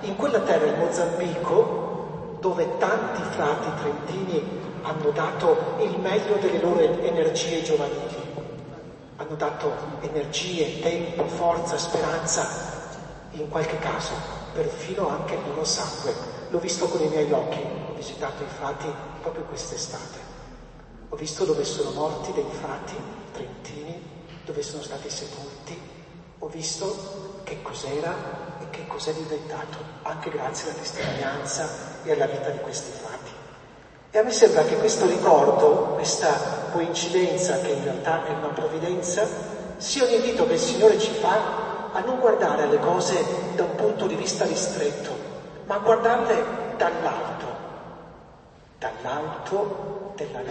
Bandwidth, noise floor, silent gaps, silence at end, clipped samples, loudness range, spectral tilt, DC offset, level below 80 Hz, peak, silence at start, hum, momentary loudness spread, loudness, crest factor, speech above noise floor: 8.8 kHz; -50 dBFS; none; 0 s; under 0.1%; 11 LU; -4 dB/octave; under 0.1%; -54 dBFS; -2 dBFS; 0 s; none; 16 LU; -25 LUFS; 24 dB; 25 dB